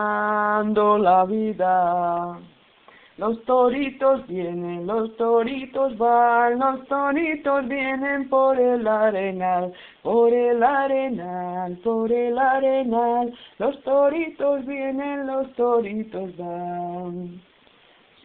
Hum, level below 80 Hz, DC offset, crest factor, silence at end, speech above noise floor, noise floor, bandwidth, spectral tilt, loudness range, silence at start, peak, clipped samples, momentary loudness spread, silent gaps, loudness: none; -60 dBFS; under 0.1%; 16 dB; 0.85 s; 34 dB; -55 dBFS; 4.2 kHz; -10.5 dB/octave; 4 LU; 0 s; -6 dBFS; under 0.1%; 11 LU; none; -22 LUFS